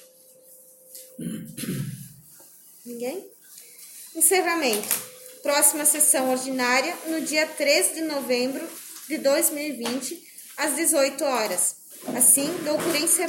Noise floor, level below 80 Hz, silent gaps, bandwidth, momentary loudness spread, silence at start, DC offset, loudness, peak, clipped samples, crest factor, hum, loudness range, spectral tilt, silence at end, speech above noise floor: -52 dBFS; -72 dBFS; none; 17 kHz; 20 LU; 0.5 s; under 0.1%; -22 LUFS; -6 dBFS; under 0.1%; 20 dB; none; 15 LU; -1.5 dB/octave; 0 s; 29 dB